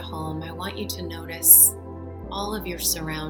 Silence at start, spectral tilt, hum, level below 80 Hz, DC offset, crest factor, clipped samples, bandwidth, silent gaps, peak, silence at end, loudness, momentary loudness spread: 0 s; -2 dB/octave; none; -44 dBFS; under 0.1%; 24 dB; under 0.1%; 18 kHz; none; 0 dBFS; 0 s; -16 LUFS; 23 LU